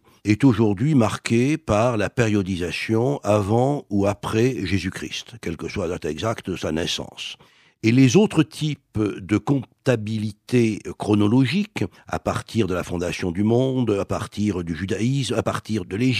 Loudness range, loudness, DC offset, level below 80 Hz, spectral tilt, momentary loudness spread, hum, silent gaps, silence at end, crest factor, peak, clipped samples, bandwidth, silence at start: 4 LU; -22 LUFS; under 0.1%; -48 dBFS; -6 dB/octave; 10 LU; none; none; 0 s; 18 dB; -4 dBFS; under 0.1%; 14.5 kHz; 0.25 s